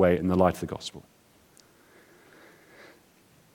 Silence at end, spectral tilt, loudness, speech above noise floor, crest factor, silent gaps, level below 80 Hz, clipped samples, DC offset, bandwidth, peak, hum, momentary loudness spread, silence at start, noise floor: 2.55 s; -6.5 dB/octave; -26 LUFS; 35 dB; 22 dB; none; -56 dBFS; under 0.1%; under 0.1%; 17.5 kHz; -8 dBFS; none; 18 LU; 0 s; -60 dBFS